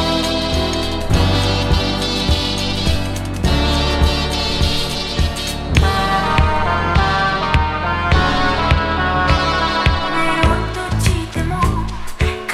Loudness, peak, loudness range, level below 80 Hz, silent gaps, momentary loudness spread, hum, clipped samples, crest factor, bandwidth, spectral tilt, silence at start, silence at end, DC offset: -17 LUFS; 0 dBFS; 2 LU; -22 dBFS; none; 5 LU; none; under 0.1%; 16 dB; 14.5 kHz; -5 dB/octave; 0 s; 0 s; under 0.1%